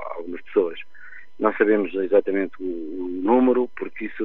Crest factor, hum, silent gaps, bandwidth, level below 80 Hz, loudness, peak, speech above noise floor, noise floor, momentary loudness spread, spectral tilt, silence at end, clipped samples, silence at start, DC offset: 20 dB; none; none; 4.1 kHz; -66 dBFS; -23 LUFS; -4 dBFS; 24 dB; -46 dBFS; 13 LU; -9 dB/octave; 0 s; under 0.1%; 0 s; 2%